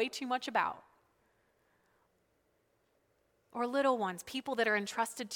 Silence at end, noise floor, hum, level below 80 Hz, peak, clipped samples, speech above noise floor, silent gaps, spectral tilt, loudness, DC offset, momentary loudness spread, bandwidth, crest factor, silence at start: 0 s; -76 dBFS; none; -80 dBFS; -16 dBFS; under 0.1%; 41 dB; none; -3 dB/octave; -34 LUFS; under 0.1%; 9 LU; 19 kHz; 22 dB; 0 s